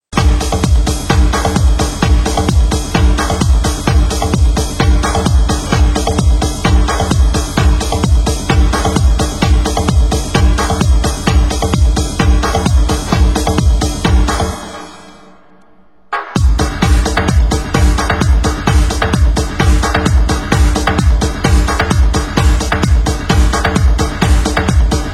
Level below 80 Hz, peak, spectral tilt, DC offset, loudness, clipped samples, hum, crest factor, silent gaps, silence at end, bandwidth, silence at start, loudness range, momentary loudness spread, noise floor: -14 dBFS; 0 dBFS; -5 dB/octave; 0.7%; -13 LUFS; under 0.1%; none; 12 dB; none; 0 s; 16 kHz; 0.1 s; 3 LU; 2 LU; -48 dBFS